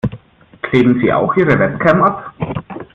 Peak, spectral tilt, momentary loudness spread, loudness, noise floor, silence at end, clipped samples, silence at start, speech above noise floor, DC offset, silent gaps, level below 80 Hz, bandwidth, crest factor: 0 dBFS; -9 dB/octave; 12 LU; -14 LUFS; -40 dBFS; 0.1 s; under 0.1%; 0.05 s; 27 dB; under 0.1%; none; -44 dBFS; 7.2 kHz; 14 dB